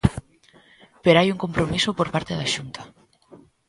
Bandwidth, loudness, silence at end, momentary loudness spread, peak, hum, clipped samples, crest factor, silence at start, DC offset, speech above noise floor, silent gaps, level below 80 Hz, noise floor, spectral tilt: 11.5 kHz; -22 LUFS; 0.3 s; 18 LU; 0 dBFS; none; under 0.1%; 24 dB; 0.05 s; under 0.1%; 33 dB; none; -42 dBFS; -55 dBFS; -5 dB/octave